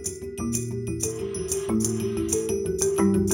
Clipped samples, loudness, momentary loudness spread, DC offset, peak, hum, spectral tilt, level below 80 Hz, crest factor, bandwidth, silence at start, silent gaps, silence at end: under 0.1%; -26 LUFS; 8 LU; under 0.1%; -8 dBFS; none; -5 dB/octave; -46 dBFS; 18 dB; 17.5 kHz; 0 s; none; 0 s